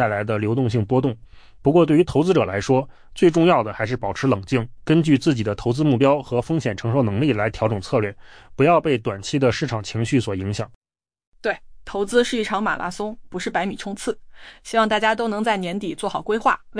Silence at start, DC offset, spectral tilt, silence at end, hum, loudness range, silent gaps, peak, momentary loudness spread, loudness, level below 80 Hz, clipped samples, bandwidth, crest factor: 0 s; under 0.1%; -6.5 dB/octave; 0 s; none; 5 LU; 10.75-10.81 s, 11.27-11.32 s; -6 dBFS; 11 LU; -21 LUFS; -48 dBFS; under 0.1%; 10.5 kHz; 16 dB